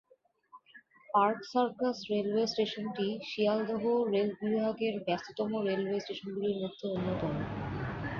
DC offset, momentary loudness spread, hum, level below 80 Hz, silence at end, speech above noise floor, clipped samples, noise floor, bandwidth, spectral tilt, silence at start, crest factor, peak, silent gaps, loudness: under 0.1%; 7 LU; none; -60 dBFS; 0 s; 34 dB; under 0.1%; -66 dBFS; 7.2 kHz; -6.5 dB/octave; 0.55 s; 18 dB; -14 dBFS; none; -33 LUFS